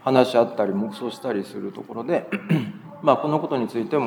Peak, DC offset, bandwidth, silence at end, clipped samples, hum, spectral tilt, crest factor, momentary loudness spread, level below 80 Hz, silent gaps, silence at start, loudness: -2 dBFS; under 0.1%; 20 kHz; 0 s; under 0.1%; none; -7 dB/octave; 20 dB; 13 LU; -80 dBFS; none; 0.05 s; -24 LUFS